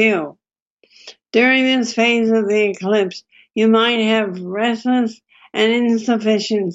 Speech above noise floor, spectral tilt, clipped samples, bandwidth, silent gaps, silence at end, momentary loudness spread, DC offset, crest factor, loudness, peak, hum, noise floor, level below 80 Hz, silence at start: 45 dB; -4.5 dB/octave; under 0.1%; 8 kHz; 0.60-0.77 s; 0 s; 10 LU; under 0.1%; 14 dB; -16 LUFS; -2 dBFS; none; -61 dBFS; -72 dBFS; 0 s